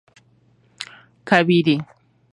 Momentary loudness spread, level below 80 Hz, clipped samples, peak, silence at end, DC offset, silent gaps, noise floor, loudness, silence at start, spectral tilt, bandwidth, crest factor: 23 LU; -68 dBFS; under 0.1%; 0 dBFS; 0.5 s; under 0.1%; none; -58 dBFS; -18 LUFS; 0.8 s; -6.5 dB/octave; 11 kHz; 22 dB